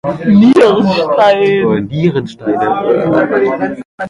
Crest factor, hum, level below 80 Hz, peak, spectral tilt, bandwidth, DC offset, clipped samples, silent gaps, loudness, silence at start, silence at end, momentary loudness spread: 10 dB; none; -46 dBFS; 0 dBFS; -7.5 dB/octave; 11 kHz; under 0.1%; under 0.1%; 3.85-3.98 s; -11 LUFS; 0.05 s; 0 s; 9 LU